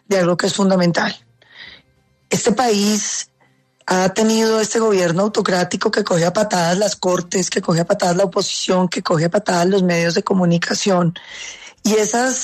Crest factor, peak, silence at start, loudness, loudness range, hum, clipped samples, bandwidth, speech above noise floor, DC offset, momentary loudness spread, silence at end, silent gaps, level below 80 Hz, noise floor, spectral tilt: 14 dB; -4 dBFS; 0.1 s; -17 LUFS; 2 LU; none; under 0.1%; 13.5 kHz; 42 dB; under 0.1%; 6 LU; 0 s; none; -58 dBFS; -59 dBFS; -4.5 dB/octave